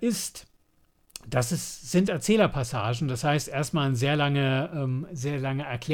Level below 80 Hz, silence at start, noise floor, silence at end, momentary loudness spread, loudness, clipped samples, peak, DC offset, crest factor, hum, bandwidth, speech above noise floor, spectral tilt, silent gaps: -54 dBFS; 0 s; -65 dBFS; 0 s; 8 LU; -27 LUFS; under 0.1%; -10 dBFS; under 0.1%; 18 dB; none; 18.5 kHz; 39 dB; -5.5 dB/octave; none